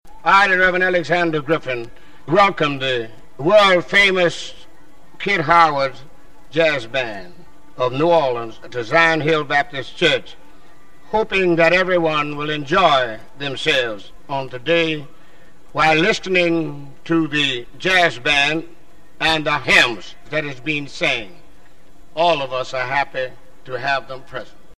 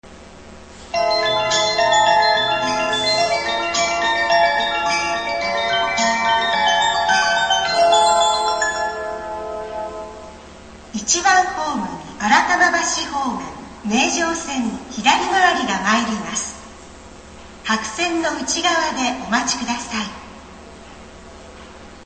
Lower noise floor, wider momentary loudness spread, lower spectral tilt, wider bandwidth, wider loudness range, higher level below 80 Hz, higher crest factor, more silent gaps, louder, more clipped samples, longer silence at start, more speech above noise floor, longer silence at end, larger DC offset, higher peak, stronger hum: first, -49 dBFS vs -40 dBFS; about the same, 15 LU vs 13 LU; first, -4.5 dB/octave vs -1.5 dB/octave; first, 13.5 kHz vs 9 kHz; about the same, 5 LU vs 5 LU; about the same, -48 dBFS vs -48 dBFS; about the same, 20 dB vs 20 dB; neither; about the same, -17 LUFS vs -18 LUFS; neither; about the same, 0 s vs 0.05 s; first, 32 dB vs 20 dB; about the same, 0 s vs 0 s; first, 2% vs under 0.1%; about the same, 0 dBFS vs 0 dBFS; neither